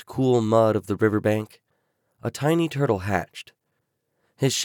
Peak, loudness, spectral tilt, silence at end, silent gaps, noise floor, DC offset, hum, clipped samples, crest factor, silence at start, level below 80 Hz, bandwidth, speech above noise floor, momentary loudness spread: -6 dBFS; -23 LUFS; -5.5 dB/octave; 0 s; none; -76 dBFS; under 0.1%; none; under 0.1%; 18 dB; 0.1 s; -60 dBFS; 19 kHz; 53 dB; 14 LU